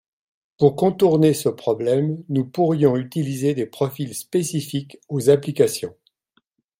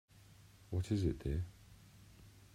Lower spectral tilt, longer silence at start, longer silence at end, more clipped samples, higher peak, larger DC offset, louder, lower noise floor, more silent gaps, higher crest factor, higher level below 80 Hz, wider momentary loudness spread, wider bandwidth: about the same, -6.5 dB/octave vs -7.5 dB/octave; first, 0.6 s vs 0.3 s; first, 0.9 s vs 0.1 s; neither; first, -2 dBFS vs -22 dBFS; neither; first, -21 LUFS vs -40 LUFS; first, -67 dBFS vs -62 dBFS; neither; about the same, 18 dB vs 20 dB; second, -62 dBFS vs -52 dBFS; second, 10 LU vs 25 LU; first, 16.5 kHz vs 14.5 kHz